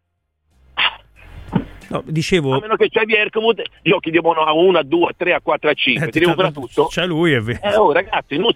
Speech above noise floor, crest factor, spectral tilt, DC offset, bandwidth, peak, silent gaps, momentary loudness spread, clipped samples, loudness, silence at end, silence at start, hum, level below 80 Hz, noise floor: 53 dB; 16 dB; -5.5 dB/octave; under 0.1%; 13 kHz; -2 dBFS; none; 8 LU; under 0.1%; -16 LUFS; 0 s; 0.75 s; none; -46 dBFS; -69 dBFS